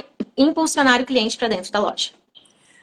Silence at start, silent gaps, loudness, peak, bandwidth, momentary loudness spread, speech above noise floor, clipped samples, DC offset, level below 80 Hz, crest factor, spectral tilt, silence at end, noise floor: 0.2 s; none; -19 LUFS; 0 dBFS; 12.5 kHz; 10 LU; 34 dB; under 0.1%; under 0.1%; -58 dBFS; 20 dB; -2.5 dB/octave; 0.75 s; -53 dBFS